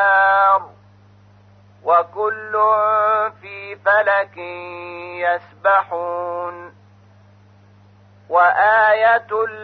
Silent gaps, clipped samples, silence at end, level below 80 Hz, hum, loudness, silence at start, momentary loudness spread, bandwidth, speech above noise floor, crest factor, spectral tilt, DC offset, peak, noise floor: none; under 0.1%; 0 s; -70 dBFS; 50 Hz at -50 dBFS; -17 LUFS; 0 s; 18 LU; 6 kHz; 31 dB; 16 dB; -5.5 dB/octave; under 0.1%; -4 dBFS; -49 dBFS